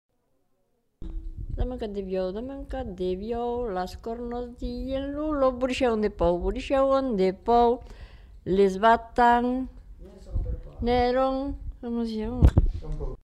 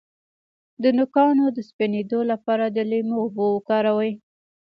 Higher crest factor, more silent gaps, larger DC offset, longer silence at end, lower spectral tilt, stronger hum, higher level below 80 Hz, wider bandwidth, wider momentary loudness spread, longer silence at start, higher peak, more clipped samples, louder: first, 22 dB vs 16 dB; second, none vs 1.73-1.79 s; neither; second, 0.05 s vs 0.55 s; about the same, -7.5 dB/octave vs -8.5 dB/octave; neither; first, -34 dBFS vs -72 dBFS; first, 11.5 kHz vs 5.8 kHz; first, 15 LU vs 7 LU; first, 1 s vs 0.8 s; about the same, -4 dBFS vs -6 dBFS; neither; second, -26 LUFS vs -22 LUFS